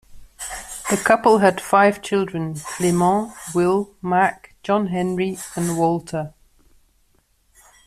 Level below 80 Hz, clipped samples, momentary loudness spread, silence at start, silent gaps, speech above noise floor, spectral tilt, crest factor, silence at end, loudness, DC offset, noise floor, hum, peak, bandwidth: -52 dBFS; under 0.1%; 13 LU; 0.1 s; none; 42 dB; -5.5 dB/octave; 18 dB; 1.6 s; -20 LUFS; under 0.1%; -61 dBFS; none; -2 dBFS; 15 kHz